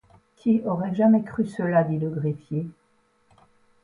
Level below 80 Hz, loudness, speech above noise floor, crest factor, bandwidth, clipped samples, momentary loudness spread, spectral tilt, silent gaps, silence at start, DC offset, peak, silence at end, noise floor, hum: -62 dBFS; -24 LUFS; 42 dB; 16 dB; 10 kHz; under 0.1%; 11 LU; -10 dB/octave; none; 0.45 s; under 0.1%; -8 dBFS; 1.15 s; -65 dBFS; none